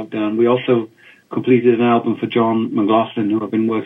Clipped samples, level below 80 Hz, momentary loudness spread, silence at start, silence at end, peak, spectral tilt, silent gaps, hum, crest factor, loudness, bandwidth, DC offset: under 0.1%; -66 dBFS; 7 LU; 0 s; 0 s; -2 dBFS; -9 dB/octave; none; none; 16 dB; -17 LUFS; 3.9 kHz; under 0.1%